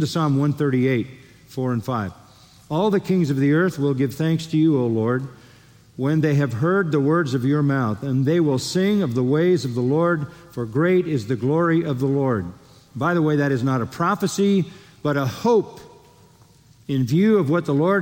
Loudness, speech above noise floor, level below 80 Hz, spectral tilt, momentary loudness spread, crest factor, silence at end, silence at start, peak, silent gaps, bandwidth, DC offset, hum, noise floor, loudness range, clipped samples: -21 LUFS; 32 dB; -60 dBFS; -7 dB/octave; 8 LU; 12 dB; 0 s; 0 s; -8 dBFS; none; 17 kHz; under 0.1%; none; -52 dBFS; 3 LU; under 0.1%